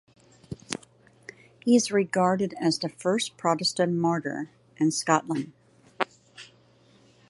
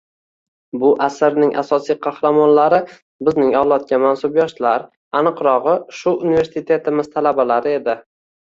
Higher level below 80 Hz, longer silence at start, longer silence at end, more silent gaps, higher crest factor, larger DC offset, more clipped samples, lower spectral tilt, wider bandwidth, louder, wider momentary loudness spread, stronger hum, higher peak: second, -68 dBFS vs -58 dBFS; second, 0.5 s vs 0.75 s; first, 0.85 s vs 0.45 s; second, none vs 3.02-3.19 s, 4.97-5.11 s; first, 24 dB vs 16 dB; neither; neither; second, -4.5 dB/octave vs -6.5 dB/octave; first, 11.5 kHz vs 7.6 kHz; second, -26 LUFS vs -16 LUFS; first, 24 LU vs 7 LU; neither; about the same, -4 dBFS vs -2 dBFS